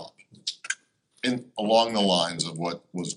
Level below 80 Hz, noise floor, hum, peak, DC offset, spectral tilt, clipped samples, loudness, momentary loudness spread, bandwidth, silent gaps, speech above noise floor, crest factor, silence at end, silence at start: -68 dBFS; -57 dBFS; none; -8 dBFS; under 0.1%; -3.5 dB/octave; under 0.1%; -26 LUFS; 12 LU; 11.5 kHz; none; 31 dB; 20 dB; 0 s; 0 s